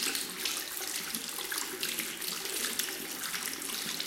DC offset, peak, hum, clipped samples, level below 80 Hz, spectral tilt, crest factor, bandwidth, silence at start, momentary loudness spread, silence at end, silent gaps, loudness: under 0.1%; -12 dBFS; none; under 0.1%; -72 dBFS; 0.5 dB/octave; 24 dB; 17 kHz; 0 s; 3 LU; 0 s; none; -33 LUFS